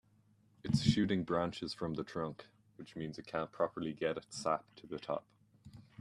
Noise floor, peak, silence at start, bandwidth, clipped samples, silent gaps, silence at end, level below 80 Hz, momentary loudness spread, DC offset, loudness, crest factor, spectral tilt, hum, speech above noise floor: -70 dBFS; -14 dBFS; 0.65 s; 12 kHz; under 0.1%; none; 0.2 s; -64 dBFS; 16 LU; under 0.1%; -38 LUFS; 24 dB; -6 dB/octave; none; 32 dB